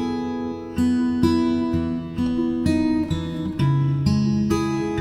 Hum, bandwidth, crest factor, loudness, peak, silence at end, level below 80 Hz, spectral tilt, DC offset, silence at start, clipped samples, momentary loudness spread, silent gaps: none; 14 kHz; 16 dB; -22 LUFS; -6 dBFS; 0 s; -42 dBFS; -7.5 dB/octave; under 0.1%; 0 s; under 0.1%; 7 LU; none